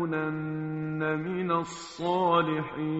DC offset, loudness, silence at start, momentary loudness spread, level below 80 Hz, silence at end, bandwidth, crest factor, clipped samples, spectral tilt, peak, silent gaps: under 0.1%; -29 LUFS; 0 s; 9 LU; -64 dBFS; 0 s; 8 kHz; 18 dB; under 0.1%; -5.5 dB/octave; -10 dBFS; none